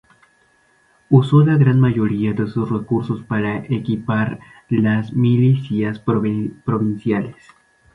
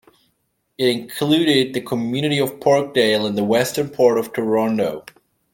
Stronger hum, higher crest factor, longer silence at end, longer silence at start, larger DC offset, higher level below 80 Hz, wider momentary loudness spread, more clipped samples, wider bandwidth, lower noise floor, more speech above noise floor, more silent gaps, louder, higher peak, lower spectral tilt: neither; about the same, 16 dB vs 16 dB; about the same, 0.6 s vs 0.55 s; first, 1.1 s vs 0.8 s; neither; first, -52 dBFS vs -62 dBFS; first, 9 LU vs 6 LU; neither; second, 4.6 kHz vs 17 kHz; second, -58 dBFS vs -69 dBFS; second, 40 dB vs 51 dB; neither; about the same, -18 LUFS vs -19 LUFS; about the same, -2 dBFS vs -2 dBFS; first, -10 dB/octave vs -5 dB/octave